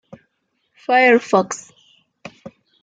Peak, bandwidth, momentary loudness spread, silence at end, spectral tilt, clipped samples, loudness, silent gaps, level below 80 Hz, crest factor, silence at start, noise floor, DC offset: -2 dBFS; 9.2 kHz; 24 LU; 0.35 s; -4 dB/octave; under 0.1%; -16 LUFS; none; -70 dBFS; 18 dB; 0.9 s; -70 dBFS; under 0.1%